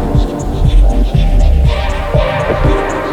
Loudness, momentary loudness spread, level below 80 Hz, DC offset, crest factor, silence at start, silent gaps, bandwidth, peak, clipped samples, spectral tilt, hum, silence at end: -13 LUFS; 3 LU; -12 dBFS; under 0.1%; 10 dB; 0 s; none; 9 kHz; 0 dBFS; under 0.1%; -7 dB/octave; none; 0 s